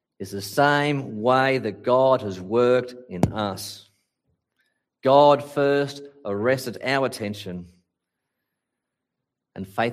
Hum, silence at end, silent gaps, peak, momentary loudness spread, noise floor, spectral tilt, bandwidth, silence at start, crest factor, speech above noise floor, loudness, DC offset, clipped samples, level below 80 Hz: none; 0 s; none; -2 dBFS; 17 LU; -83 dBFS; -5.5 dB/octave; 15.5 kHz; 0.2 s; 22 dB; 61 dB; -22 LUFS; under 0.1%; under 0.1%; -56 dBFS